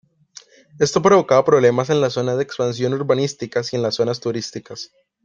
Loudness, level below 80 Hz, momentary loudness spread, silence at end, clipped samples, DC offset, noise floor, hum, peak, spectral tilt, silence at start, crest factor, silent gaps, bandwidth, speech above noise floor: -18 LUFS; -60 dBFS; 15 LU; 0.4 s; under 0.1%; under 0.1%; -46 dBFS; none; 0 dBFS; -5 dB/octave; 0.75 s; 18 dB; none; 9.4 kHz; 28 dB